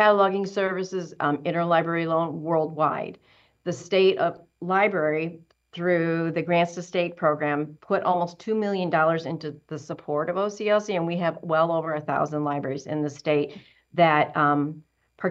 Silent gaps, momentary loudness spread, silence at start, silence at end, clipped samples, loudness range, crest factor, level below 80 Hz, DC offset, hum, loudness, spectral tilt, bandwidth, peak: none; 12 LU; 0 s; 0 s; under 0.1%; 2 LU; 18 dB; -72 dBFS; under 0.1%; none; -25 LUFS; -6.5 dB/octave; 8 kHz; -6 dBFS